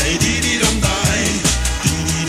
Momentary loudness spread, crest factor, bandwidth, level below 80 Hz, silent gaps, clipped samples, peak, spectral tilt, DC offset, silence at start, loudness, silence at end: 3 LU; 16 dB; 16 kHz; -24 dBFS; none; under 0.1%; 0 dBFS; -3 dB/octave; under 0.1%; 0 s; -16 LUFS; 0 s